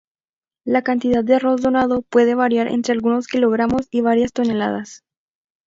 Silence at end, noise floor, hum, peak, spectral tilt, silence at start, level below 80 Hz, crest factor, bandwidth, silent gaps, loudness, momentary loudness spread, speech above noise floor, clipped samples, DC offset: 0.7 s; under -90 dBFS; none; -2 dBFS; -6 dB/octave; 0.65 s; -52 dBFS; 16 dB; 7.8 kHz; none; -18 LUFS; 5 LU; over 73 dB; under 0.1%; under 0.1%